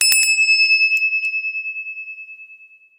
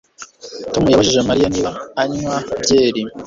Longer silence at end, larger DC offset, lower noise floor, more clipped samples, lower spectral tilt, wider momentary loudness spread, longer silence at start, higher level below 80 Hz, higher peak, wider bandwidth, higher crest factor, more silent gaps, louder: first, 0.45 s vs 0 s; neither; first, -46 dBFS vs -37 dBFS; neither; second, 6 dB/octave vs -4.5 dB/octave; first, 20 LU vs 12 LU; second, 0 s vs 0.2 s; second, under -90 dBFS vs -42 dBFS; about the same, -2 dBFS vs -2 dBFS; first, 16.5 kHz vs 7.8 kHz; about the same, 18 dB vs 16 dB; neither; about the same, -14 LUFS vs -16 LUFS